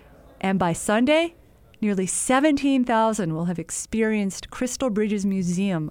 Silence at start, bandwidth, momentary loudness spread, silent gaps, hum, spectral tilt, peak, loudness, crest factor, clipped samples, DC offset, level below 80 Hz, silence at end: 0.45 s; 19.5 kHz; 9 LU; none; none; -5 dB/octave; -6 dBFS; -23 LUFS; 18 dB; under 0.1%; under 0.1%; -52 dBFS; 0 s